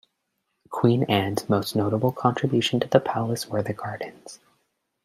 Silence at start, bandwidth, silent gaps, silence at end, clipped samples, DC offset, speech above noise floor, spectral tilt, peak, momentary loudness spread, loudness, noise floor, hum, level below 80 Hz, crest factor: 0.7 s; 16 kHz; none; 0.7 s; under 0.1%; under 0.1%; 53 dB; -6 dB/octave; -2 dBFS; 14 LU; -24 LUFS; -77 dBFS; none; -64 dBFS; 22 dB